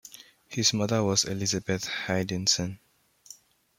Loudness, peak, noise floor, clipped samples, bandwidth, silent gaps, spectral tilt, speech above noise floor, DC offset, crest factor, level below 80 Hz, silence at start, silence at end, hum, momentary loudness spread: -27 LUFS; -8 dBFS; -53 dBFS; under 0.1%; 16.5 kHz; none; -3 dB/octave; 26 dB; under 0.1%; 22 dB; -62 dBFS; 0.05 s; 0.45 s; none; 9 LU